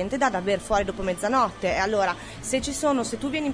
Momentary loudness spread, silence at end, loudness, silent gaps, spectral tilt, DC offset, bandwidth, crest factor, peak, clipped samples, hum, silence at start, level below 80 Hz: 5 LU; 0 s; -25 LUFS; none; -4 dB/octave; under 0.1%; 11 kHz; 16 dB; -10 dBFS; under 0.1%; none; 0 s; -44 dBFS